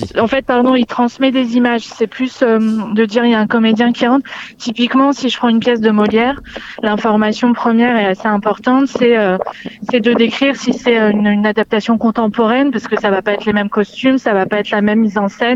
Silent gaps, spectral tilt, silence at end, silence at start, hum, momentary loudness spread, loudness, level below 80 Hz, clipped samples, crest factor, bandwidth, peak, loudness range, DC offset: none; -6 dB/octave; 0 s; 0 s; none; 6 LU; -13 LUFS; -50 dBFS; under 0.1%; 12 dB; 7.8 kHz; 0 dBFS; 1 LU; under 0.1%